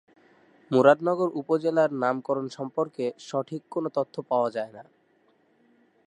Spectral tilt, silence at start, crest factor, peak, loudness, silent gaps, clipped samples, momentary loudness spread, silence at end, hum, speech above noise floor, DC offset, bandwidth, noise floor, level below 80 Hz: -7 dB/octave; 0.7 s; 22 dB; -4 dBFS; -26 LUFS; none; under 0.1%; 12 LU; 1.25 s; none; 40 dB; under 0.1%; 10 kHz; -65 dBFS; -82 dBFS